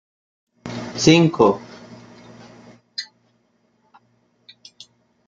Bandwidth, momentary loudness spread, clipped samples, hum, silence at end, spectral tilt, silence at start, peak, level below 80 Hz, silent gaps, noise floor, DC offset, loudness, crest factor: 7.8 kHz; 27 LU; under 0.1%; 60 Hz at -50 dBFS; 2.25 s; -5 dB/octave; 0.65 s; -2 dBFS; -58 dBFS; none; -64 dBFS; under 0.1%; -18 LUFS; 22 dB